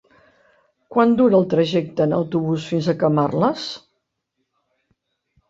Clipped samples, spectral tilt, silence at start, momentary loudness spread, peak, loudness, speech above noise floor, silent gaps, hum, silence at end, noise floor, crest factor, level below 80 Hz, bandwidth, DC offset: under 0.1%; -7.5 dB/octave; 0.9 s; 8 LU; -2 dBFS; -19 LUFS; 57 dB; none; none; 1.7 s; -75 dBFS; 18 dB; -60 dBFS; 7.8 kHz; under 0.1%